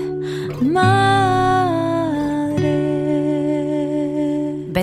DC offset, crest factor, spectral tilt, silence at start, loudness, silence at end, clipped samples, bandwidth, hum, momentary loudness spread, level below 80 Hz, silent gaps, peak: under 0.1%; 14 dB; -7 dB/octave; 0 s; -18 LUFS; 0 s; under 0.1%; 11 kHz; none; 7 LU; -44 dBFS; none; -4 dBFS